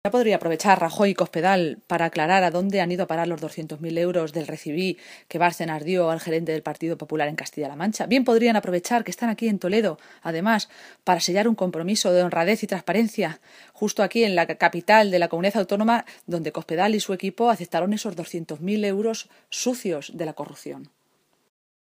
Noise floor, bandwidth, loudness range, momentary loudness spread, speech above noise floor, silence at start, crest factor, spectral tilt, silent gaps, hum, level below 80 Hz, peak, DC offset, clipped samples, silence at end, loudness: -68 dBFS; 15.5 kHz; 4 LU; 12 LU; 44 dB; 0.05 s; 22 dB; -4.5 dB/octave; none; none; -72 dBFS; -2 dBFS; under 0.1%; under 0.1%; 1.05 s; -23 LUFS